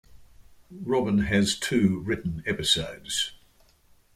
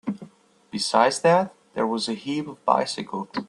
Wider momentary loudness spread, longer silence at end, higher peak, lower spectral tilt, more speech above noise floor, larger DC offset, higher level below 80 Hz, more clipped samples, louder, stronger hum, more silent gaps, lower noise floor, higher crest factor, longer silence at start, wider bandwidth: second, 7 LU vs 12 LU; first, 0.8 s vs 0.05 s; second, -8 dBFS vs -2 dBFS; about the same, -4 dB/octave vs -4 dB/octave; first, 34 dB vs 27 dB; neither; first, -50 dBFS vs -70 dBFS; neither; about the same, -26 LUFS vs -24 LUFS; neither; neither; first, -60 dBFS vs -50 dBFS; about the same, 20 dB vs 22 dB; about the same, 0.15 s vs 0.05 s; first, 15.5 kHz vs 12 kHz